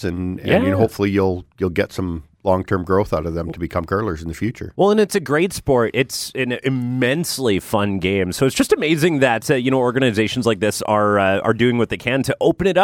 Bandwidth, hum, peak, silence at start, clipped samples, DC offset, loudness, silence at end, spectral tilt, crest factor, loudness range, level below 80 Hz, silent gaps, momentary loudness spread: 17 kHz; none; -2 dBFS; 0 s; under 0.1%; under 0.1%; -19 LUFS; 0 s; -5.5 dB/octave; 16 dB; 4 LU; -44 dBFS; none; 8 LU